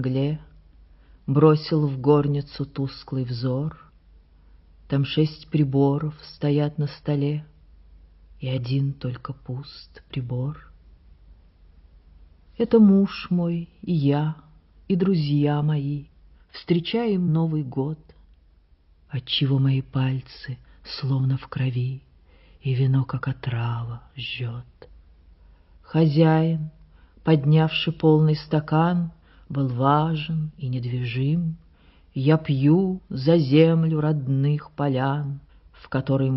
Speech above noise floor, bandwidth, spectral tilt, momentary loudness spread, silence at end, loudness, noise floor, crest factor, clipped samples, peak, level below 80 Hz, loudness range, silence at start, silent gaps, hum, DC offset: 35 dB; 5.8 kHz; -7 dB/octave; 15 LU; 0 s; -23 LUFS; -57 dBFS; 20 dB; under 0.1%; -4 dBFS; -52 dBFS; 8 LU; 0 s; none; none; under 0.1%